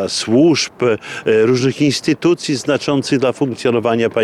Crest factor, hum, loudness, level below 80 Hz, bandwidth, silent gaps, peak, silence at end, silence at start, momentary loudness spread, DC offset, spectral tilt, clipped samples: 10 dB; none; -15 LUFS; -58 dBFS; 12.5 kHz; none; -4 dBFS; 0 s; 0 s; 5 LU; under 0.1%; -5 dB/octave; under 0.1%